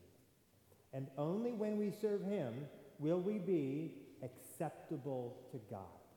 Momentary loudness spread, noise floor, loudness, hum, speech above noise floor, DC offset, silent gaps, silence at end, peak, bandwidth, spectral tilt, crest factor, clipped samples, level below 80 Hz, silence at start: 14 LU; -71 dBFS; -42 LUFS; none; 30 dB; under 0.1%; none; 0.15 s; -26 dBFS; 19 kHz; -8 dB/octave; 16 dB; under 0.1%; -84 dBFS; 0 s